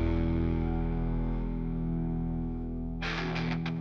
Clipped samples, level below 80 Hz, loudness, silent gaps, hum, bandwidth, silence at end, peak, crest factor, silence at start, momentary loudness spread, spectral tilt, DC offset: under 0.1%; -36 dBFS; -33 LUFS; none; none; 6.6 kHz; 0 s; -16 dBFS; 14 dB; 0 s; 5 LU; -8 dB/octave; under 0.1%